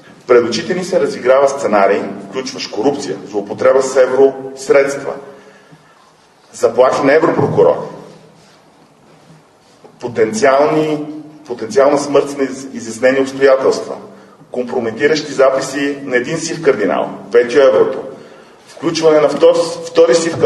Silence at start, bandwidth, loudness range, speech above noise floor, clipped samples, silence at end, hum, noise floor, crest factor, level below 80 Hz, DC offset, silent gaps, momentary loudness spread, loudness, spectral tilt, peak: 0.3 s; 12 kHz; 4 LU; 35 dB; under 0.1%; 0 s; none; -47 dBFS; 14 dB; -60 dBFS; under 0.1%; none; 13 LU; -13 LUFS; -4.5 dB/octave; 0 dBFS